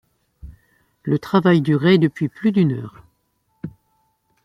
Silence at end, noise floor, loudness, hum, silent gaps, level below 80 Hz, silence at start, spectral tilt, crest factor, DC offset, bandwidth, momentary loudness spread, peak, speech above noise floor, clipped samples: 0.75 s; -68 dBFS; -18 LUFS; none; none; -52 dBFS; 0.45 s; -8.5 dB/octave; 18 dB; under 0.1%; 10 kHz; 21 LU; -2 dBFS; 50 dB; under 0.1%